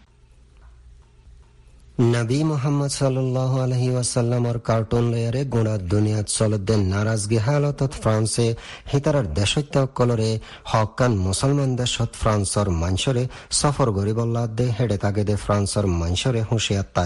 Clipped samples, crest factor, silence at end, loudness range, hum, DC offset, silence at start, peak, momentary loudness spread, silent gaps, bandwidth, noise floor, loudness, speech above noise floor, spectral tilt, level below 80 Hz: under 0.1%; 16 dB; 0 s; 1 LU; none; 0.2%; 0.65 s; -6 dBFS; 3 LU; none; 11.5 kHz; -52 dBFS; -22 LUFS; 31 dB; -5.5 dB/octave; -40 dBFS